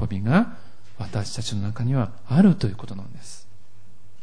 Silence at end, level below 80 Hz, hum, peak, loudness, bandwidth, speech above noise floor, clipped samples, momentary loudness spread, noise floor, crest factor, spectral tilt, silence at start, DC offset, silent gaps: 0.85 s; -50 dBFS; none; -6 dBFS; -23 LUFS; 10.5 kHz; 33 dB; under 0.1%; 22 LU; -55 dBFS; 18 dB; -7 dB/octave; 0 s; 3%; none